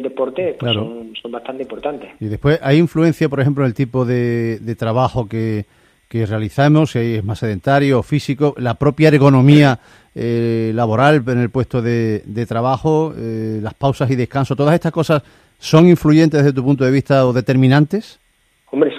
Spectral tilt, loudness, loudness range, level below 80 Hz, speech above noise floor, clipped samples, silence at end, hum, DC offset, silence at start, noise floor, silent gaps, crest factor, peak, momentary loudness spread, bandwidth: -7.5 dB/octave; -15 LUFS; 5 LU; -46 dBFS; 42 dB; under 0.1%; 0 s; none; under 0.1%; 0 s; -57 dBFS; none; 16 dB; 0 dBFS; 14 LU; 14 kHz